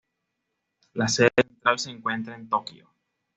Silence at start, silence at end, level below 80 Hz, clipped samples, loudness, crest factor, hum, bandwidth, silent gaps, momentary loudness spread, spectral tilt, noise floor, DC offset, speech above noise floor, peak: 0.95 s; 0.65 s; -64 dBFS; under 0.1%; -25 LUFS; 24 dB; none; 8.2 kHz; none; 12 LU; -4 dB/octave; -80 dBFS; under 0.1%; 56 dB; -2 dBFS